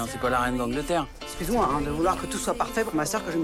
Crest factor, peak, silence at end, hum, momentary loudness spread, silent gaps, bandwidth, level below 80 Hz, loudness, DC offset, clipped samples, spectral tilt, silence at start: 14 dB; -12 dBFS; 0 s; none; 4 LU; none; 16.5 kHz; -40 dBFS; -27 LUFS; under 0.1%; under 0.1%; -4.5 dB/octave; 0 s